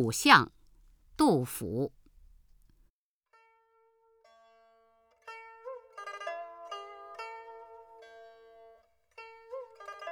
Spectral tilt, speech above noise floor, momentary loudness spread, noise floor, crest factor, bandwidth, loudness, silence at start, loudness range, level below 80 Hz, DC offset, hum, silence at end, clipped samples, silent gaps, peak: -4 dB/octave; 47 dB; 30 LU; -73 dBFS; 30 dB; over 20 kHz; -28 LUFS; 0 s; 20 LU; -64 dBFS; under 0.1%; none; 0 s; under 0.1%; 2.90-3.21 s; -4 dBFS